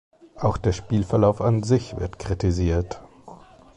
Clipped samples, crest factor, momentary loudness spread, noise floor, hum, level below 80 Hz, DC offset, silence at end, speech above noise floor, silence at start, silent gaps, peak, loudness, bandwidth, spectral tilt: under 0.1%; 18 dB; 12 LU; -46 dBFS; none; -36 dBFS; under 0.1%; 0.4 s; 24 dB; 0.35 s; none; -6 dBFS; -23 LUFS; 10 kHz; -7.5 dB/octave